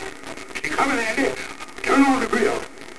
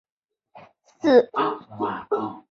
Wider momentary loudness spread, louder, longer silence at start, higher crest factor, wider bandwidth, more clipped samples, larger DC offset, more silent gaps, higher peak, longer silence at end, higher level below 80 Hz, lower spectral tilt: first, 15 LU vs 11 LU; about the same, -21 LUFS vs -23 LUFS; second, 0 s vs 0.55 s; about the same, 18 dB vs 20 dB; first, 11 kHz vs 6.8 kHz; neither; first, 2% vs under 0.1%; neither; about the same, -4 dBFS vs -4 dBFS; about the same, 0 s vs 0.1 s; first, -50 dBFS vs -68 dBFS; second, -3.5 dB/octave vs -6.5 dB/octave